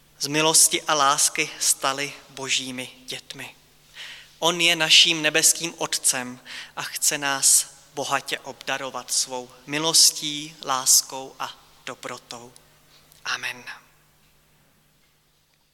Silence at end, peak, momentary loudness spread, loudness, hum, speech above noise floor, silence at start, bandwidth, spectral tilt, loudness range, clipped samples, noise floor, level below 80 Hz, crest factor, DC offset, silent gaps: 1.95 s; -4 dBFS; 22 LU; -20 LUFS; none; 40 dB; 0.2 s; 18 kHz; 0 dB/octave; 16 LU; under 0.1%; -64 dBFS; -68 dBFS; 20 dB; under 0.1%; none